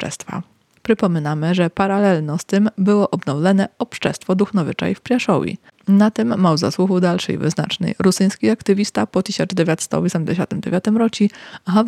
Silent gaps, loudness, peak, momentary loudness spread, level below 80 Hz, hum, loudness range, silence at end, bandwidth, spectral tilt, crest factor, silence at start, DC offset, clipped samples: none; -18 LUFS; -4 dBFS; 6 LU; -56 dBFS; none; 1 LU; 0 s; 13 kHz; -6 dB/octave; 14 dB; 0 s; under 0.1%; under 0.1%